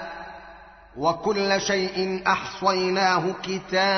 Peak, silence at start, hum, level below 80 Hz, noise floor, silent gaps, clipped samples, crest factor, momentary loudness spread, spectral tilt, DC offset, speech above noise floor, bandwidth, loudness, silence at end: -6 dBFS; 0 s; none; -56 dBFS; -47 dBFS; none; under 0.1%; 18 dB; 17 LU; -2.5 dB/octave; under 0.1%; 23 dB; 6.4 kHz; -24 LUFS; 0 s